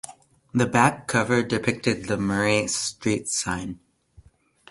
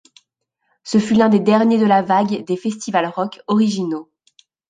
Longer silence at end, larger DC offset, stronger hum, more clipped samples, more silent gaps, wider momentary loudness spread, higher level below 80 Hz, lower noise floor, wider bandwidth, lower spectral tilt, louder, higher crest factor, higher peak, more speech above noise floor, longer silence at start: first, 0.95 s vs 0.65 s; neither; neither; neither; neither; about the same, 10 LU vs 11 LU; first, -52 dBFS vs -60 dBFS; second, -55 dBFS vs -71 dBFS; first, 11.5 kHz vs 9.4 kHz; second, -4 dB/octave vs -6 dB/octave; second, -23 LUFS vs -17 LUFS; first, 22 dB vs 16 dB; about the same, -2 dBFS vs -2 dBFS; second, 32 dB vs 55 dB; second, 0.05 s vs 0.85 s